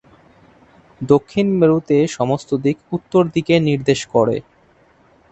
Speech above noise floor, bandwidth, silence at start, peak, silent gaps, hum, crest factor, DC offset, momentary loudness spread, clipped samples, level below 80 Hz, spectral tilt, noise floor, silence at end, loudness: 37 dB; 8.4 kHz; 1 s; 0 dBFS; none; none; 18 dB; under 0.1%; 6 LU; under 0.1%; -52 dBFS; -6.5 dB/octave; -53 dBFS; 0.9 s; -17 LUFS